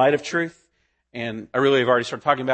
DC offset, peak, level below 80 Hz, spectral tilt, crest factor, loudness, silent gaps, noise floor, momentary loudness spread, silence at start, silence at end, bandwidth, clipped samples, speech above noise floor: under 0.1%; -4 dBFS; -66 dBFS; -5 dB/octave; 18 dB; -22 LUFS; none; -69 dBFS; 12 LU; 0 s; 0 s; 8.8 kHz; under 0.1%; 48 dB